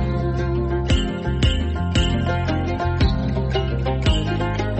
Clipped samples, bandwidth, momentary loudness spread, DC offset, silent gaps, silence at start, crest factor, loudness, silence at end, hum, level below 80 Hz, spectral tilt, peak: under 0.1%; 8.4 kHz; 3 LU; under 0.1%; none; 0 s; 12 dB; -21 LUFS; 0 s; none; -24 dBFS; -6.5 dB/octave; -8 dBFS